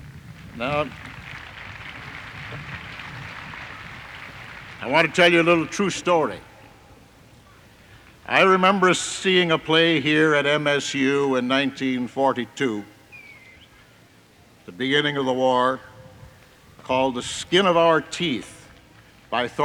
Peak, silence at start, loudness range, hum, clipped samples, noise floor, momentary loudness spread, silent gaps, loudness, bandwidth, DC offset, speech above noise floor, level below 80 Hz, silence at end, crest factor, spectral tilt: -4 dBFS; 0 s; 13 LU; none; under 0.1%; -53 dBFS; 20 LU; none; -20 LUFS; 16.5 kHz; under 0.1%; 32 dB; -56 dBFS; 0 s; 18 dB; -4 dB/octave